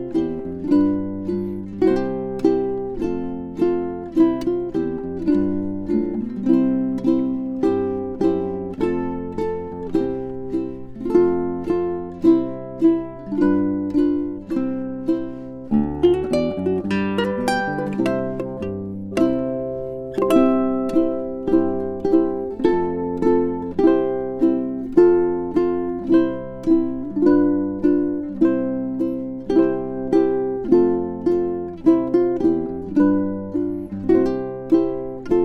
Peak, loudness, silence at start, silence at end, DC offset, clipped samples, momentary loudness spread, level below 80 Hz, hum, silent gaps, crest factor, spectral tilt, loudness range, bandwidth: -4 dBFS; -21 LUFS; 0 s; 0 s; under 0.1%; under 0.1%; 9 LU; -46 dBFS; none; none; 16 dB; -8 dB/octave; 4 LU; 11.5 kHz